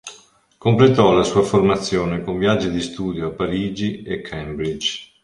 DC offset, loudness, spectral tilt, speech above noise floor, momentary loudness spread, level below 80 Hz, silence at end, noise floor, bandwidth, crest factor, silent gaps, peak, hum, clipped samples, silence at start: under 0.1%; -19 LUFS; -6 dB/octave; 31 dB; 12 LU; -44 dBFS; 0.2 s; -50 dBFS; 11.5 kHz; 18 dB; none; -2 dBFS; none; under 0.1%; 0.05 s